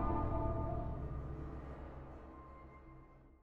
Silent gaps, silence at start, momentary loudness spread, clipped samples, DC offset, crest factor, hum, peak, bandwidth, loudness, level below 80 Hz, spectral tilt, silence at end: none; 0 s; 20 LU; under 0.1%; under 0.1%; 18 dB; none; -24 dBFS; 4.5 kHz; -43 LUFS; -46 dBFS; -10.5 dB/octave; 0 s